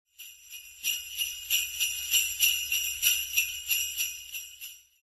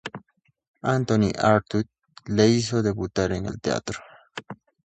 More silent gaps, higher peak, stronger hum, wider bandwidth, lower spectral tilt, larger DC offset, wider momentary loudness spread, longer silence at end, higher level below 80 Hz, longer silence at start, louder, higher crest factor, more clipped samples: second, none vs 0.67-0.74 s; second, -8 dBFS vs -4 dBFS; neither; first, 15.5 kHz vs 9 kHz; second, 4.5 dB/octave vs -6 dB/octave; neither; about the same, 20 LU vs 20 LU; about the same, 0.25 s vs 0.3 s; second, -62 dBFS vs -48 dBFS; first, 0.2 s vs 0.05 s; second, -27 LUFS vs -23 LUFS; about the same, 22 dB vs 20 dB; neither